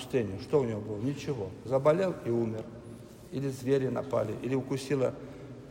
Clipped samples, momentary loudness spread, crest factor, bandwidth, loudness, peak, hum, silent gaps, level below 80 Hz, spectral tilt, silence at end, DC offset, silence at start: under 0.1%; 17 LU; 20 dB; 16 kHz; -31 LUFS; -12 dBFS; none; none; -62 dBFS; -7 dB/octave; 0 s; under 0.1%; 0 s